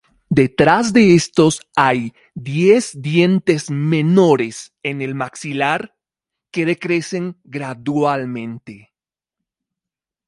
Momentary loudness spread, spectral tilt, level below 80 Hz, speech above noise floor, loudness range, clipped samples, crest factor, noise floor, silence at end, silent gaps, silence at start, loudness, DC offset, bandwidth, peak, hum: 15 LU; -6 dB/octave; -54 dBFS; 72 dB; 8 LU; under 0.1%; 18 dB; -89 dBFS; 1.5 s; none; 0.3 s; -16 LUFS; under 0.1%; 11.5 kHz; 0 dBFS; none